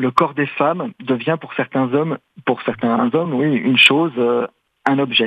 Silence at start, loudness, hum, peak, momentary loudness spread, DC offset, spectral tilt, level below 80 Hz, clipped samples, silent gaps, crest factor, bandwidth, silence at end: 0 s; -17 LUFS; none; 0 dBFS; 12 LU; under 0.1%; -6 dB/octave; -62 dBFS; under 0.1%; none; 18 dB; 13.5 kHz; 0 s